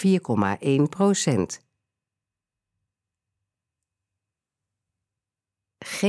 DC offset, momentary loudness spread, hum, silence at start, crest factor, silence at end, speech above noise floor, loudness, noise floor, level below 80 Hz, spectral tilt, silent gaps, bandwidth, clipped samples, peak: under 0.1%; 14 LU; none; 0 s; 20 dB; 0 s; 67 dB; -23 LUFS; -89 dBFS; -68 dBFS; -5.5 dB/octave; none; 11 kHz; under 0.1%; -8 dBFS